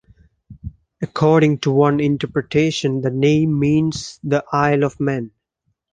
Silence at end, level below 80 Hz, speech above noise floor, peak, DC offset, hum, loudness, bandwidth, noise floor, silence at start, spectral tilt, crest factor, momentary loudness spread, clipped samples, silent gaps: 0.65 s; -48 dBFS; 54 dB; -2 dBFS; under 0.1%; none; -18 LUFS; 9.4 kHz; -71 dBFS; 0.5 s; -6.5 dB/octave; 16 dB; 15 LU; under 0.1%; none